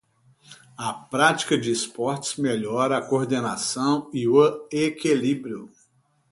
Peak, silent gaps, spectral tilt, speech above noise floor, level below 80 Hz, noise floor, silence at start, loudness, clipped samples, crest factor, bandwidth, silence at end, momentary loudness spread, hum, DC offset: -4 dBFS; none; -4.5 dB/octave; 41 dB; -66 dBFS; -64 dBFS; 0.5 s; -23 LUFS; under 0.1%; 20 dB; 11.5 kHz; 0.65 s; 10 LU; none; under 0.1%